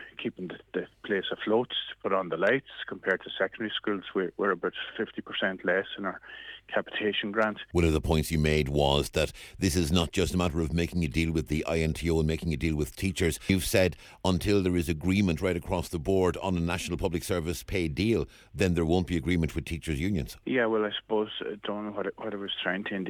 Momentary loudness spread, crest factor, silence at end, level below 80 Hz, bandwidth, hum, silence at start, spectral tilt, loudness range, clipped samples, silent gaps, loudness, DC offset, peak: 9 LU; 20 dB; 0 s; -42 dBFS; 19 kHz; none; 0 s; -5.5 dB/octave; 4 LU; under 0.1%; none; -29 LUFS; under 0.1%; -8 dBFS